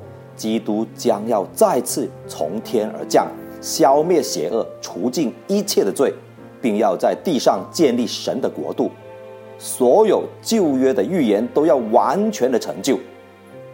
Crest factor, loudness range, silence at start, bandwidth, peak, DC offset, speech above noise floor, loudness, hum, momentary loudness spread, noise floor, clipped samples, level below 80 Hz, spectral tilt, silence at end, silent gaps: 18 dB; 3 LU; 0 s; 16.5 kHz; 0 dBFS; under 0.1%; 23 dB; -19 LUFS; none; 12 LU; -41 dBFS; under 0.1%; -66 dBFS; -4.5 dB/octave; 0 s; none